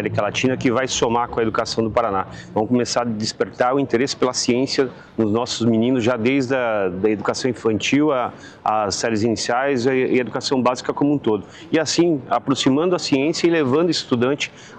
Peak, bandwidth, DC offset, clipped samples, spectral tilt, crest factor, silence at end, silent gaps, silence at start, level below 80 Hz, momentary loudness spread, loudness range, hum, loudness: -6 dBFS; 9.6 kHz; under 0.1%; under 0.1%; -4.5 dB/octave; 14 dB; 0 s; none; 0 s; -52 dBFS; 5 LU; 2 LU; none; -20 LUFS